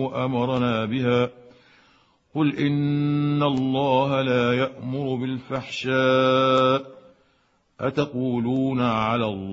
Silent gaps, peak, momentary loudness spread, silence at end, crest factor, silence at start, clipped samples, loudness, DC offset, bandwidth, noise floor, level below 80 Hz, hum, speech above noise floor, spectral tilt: none; -6 dBFS; 9 LU; 0 s; 16 dB; 0 s; under 0.1%; -23 LUFS; under 0.1%; 7.8 kHz; -65 dBFS; -58 dBFS; none; 43 dB; -7.5 dB/octave